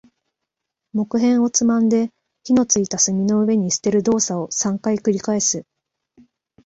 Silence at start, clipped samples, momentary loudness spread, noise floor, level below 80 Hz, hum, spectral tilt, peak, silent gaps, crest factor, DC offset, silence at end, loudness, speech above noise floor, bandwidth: 0.95 s; under 0.1%; 5 LU; -81 dBFS; -60 dBFS; none; -4.5 dB/octave; -2 dBFS; none; 16 dB; under 0.1%; 1.05 s; -19 LUFS; 63 dB; 8 kHz